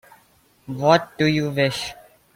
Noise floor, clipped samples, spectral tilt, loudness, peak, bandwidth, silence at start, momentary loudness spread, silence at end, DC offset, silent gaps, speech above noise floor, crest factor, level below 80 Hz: -58 dBFS; under 0.1%; -5.5 dB/octave; -20 LUFS; -2 dBFS; 16.5 kHz; 0.7 s; 13 LU; 0.4 s; under 0.1%; none; 38 dB; 20 dB; -56 dBFS